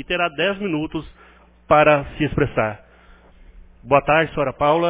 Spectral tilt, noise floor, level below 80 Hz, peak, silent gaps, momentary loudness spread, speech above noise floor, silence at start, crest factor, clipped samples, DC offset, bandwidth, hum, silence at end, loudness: -10 dB/octave; -49 dBFS; -42 dBFS; 0 dBFS; none; 11 LU; 30 dB; 0 s; 20 dB; under 0.1%; under 0.1%; 4 kHz; none; 0 s; -19 LUFS